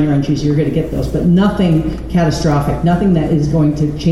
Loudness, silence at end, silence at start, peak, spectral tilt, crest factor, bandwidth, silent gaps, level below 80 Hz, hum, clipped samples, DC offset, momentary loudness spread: -14 LUFS; 0 s; 0 s; -2 dBFS; -8 dB/octave; 10 dB; 12.5 kHz; none; -28 dBFS; none; under 0.1%; 1%; 4 LU